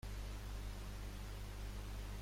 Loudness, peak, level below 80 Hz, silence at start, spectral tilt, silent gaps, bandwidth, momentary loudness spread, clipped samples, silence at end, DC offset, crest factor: -50 LUFS; -36 dBFS; -48 dBFS; 0.05 s; -5 dB/octave; none; 16.5 kHz; 1 LU; under 0.1%; 0 s; under 0.1%; 10 dB